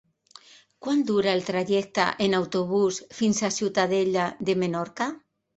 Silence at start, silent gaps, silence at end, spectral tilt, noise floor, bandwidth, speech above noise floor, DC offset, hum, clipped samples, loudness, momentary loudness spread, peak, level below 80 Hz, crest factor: 0.8 s; none; 0.4 s; -4.5 dB/octave; -53 dBFS; 8.2 kHz; 28 dB; under 0.1%; none; under 0.1%; -25 LUFS; 6 LU; -6 dBFS; -66 dBFS; 20 dB